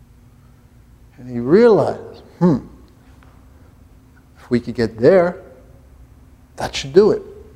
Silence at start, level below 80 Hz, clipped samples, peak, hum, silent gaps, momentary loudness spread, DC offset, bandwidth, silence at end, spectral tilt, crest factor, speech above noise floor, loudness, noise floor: 1.2 s; -46 dBFS; under 0.1%; 0 dBFS; none; none; 17 LU; under 0.1%; 12 kHz; 0.15 s; -7 dB/octave; 20 dB; 32 dB; -16 LUFS; -47 dBFS